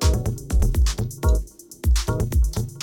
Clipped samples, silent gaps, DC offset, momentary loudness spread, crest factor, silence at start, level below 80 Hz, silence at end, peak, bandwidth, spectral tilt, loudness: under 0.1%; none; under 0.1%; 4 LU; 14 dB; 0 s; -22 dBFS; 0 s; -8 dBFS; 18 kHz; -5.5 dB/octave; -23 LUFS